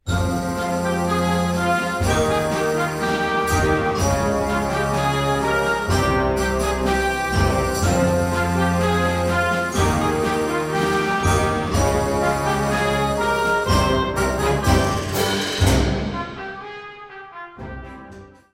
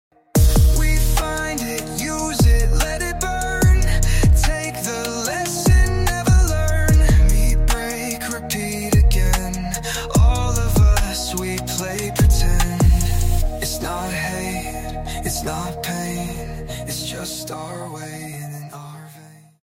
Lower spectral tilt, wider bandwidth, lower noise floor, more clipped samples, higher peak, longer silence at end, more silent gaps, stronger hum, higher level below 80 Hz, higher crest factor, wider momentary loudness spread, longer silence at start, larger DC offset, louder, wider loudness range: about the same, -5 dB/octave vs -4.5 dB/octave; about the same, 16.5 kHz vs 16.5 kHz; about the same, -42 dBFS vs -44 dBFS; neither; about the same, -4 dBFS vs -4 dBFS; second, 0.25 s vs 0.4 s; neither; neither; second, -32 dBFS vs -20 dBFS; about the same, 16 dB vs 14 dB; second, 10 LU vs 13 LU; second, 0.05 s vs 0.35 s; neither; about the same, -20 LUFS vs -20 LUFS; second, 2 LU vs 8 LU